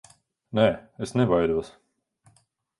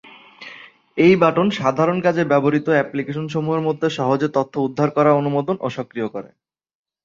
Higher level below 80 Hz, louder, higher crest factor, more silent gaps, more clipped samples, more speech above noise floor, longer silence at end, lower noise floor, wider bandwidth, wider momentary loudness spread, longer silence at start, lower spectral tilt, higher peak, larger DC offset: first, -52 dBFS vs -62 dBFS; second, -25 LUFS vs -19 LUFS; about the same, 22 dB vs 18 dB; neither; neither; first, 42 dB vs 24 dB; first, 1.1 s vs 0.8 s; first, -65 dBFS vs -42 dBFS; first, 11.5 kHz vs 7.6 kHz; about the same, 11 LU vs 13 LU; first, 0.55 s vs 0.4 s; about the same, -7 dB/octave vs -7.5 dB/octave; second, -6 dBFS vs -2 dBFS; neither